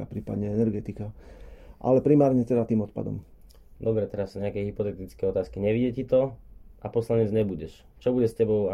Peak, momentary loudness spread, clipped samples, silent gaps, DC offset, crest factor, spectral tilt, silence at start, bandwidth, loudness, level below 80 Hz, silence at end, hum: -8 dBFS; 13 LU; under 0.1%; none; under 0.1%; 18 dB; -9.5 dB/octave; 0 s; 12.5 kHz; -26 LUFS; -50 dBFS; 0 s; none